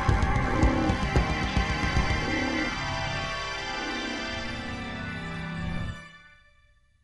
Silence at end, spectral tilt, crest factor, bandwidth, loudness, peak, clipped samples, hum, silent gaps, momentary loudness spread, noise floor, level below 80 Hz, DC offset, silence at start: 0.75 s; -5.5 dB/octave; 20 dB; 11.5 kHz; -29 LUFS; -8 dBFS; under 0.1%; none; none; 10 LU; -61 dBFS; -34 dBFS; under 0.1%; 0 s